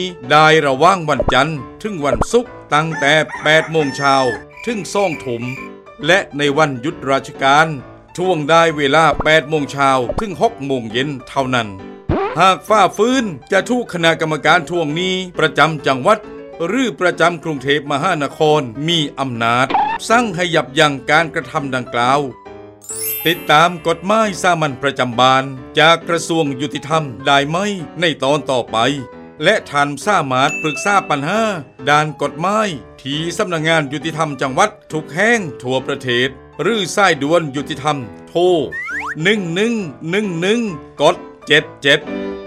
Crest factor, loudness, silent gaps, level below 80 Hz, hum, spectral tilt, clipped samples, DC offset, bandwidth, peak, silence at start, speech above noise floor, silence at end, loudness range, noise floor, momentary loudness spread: 16 dB; -16 LUFS; none; -42 dBFS; none; -4.5 dB/octave; under 0.1%; under 0.1%; 16.5 kHz; 0 dBFS; 0 s; 19 dB; 0 s; 3 LU; -35 dBFS; 10 LU